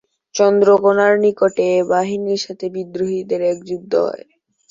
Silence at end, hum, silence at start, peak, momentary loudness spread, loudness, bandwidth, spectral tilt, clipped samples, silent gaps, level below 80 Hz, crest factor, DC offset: 0.55 s; none; 0.35 s; -2 dBFS; 13 LU; -17 LUFS; 7.6 kHz; -5 dB/octave; under 0.1%; none; -64 dBFS; 14 dB; under 0.1%